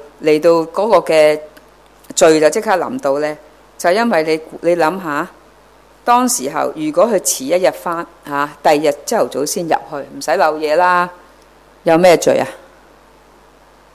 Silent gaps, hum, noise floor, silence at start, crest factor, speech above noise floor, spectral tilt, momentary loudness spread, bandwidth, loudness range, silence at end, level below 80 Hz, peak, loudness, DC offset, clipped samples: none; none; -46 dBFS; 0.2 s; 16 dB; 32 dB; -3.5 dB/octave; 12 LU; 15.5 kHz; 3 LU; 1.4 s; -54 dBFS; 0 dBFS; -15 LUFS; under 0.1%; under 0.1%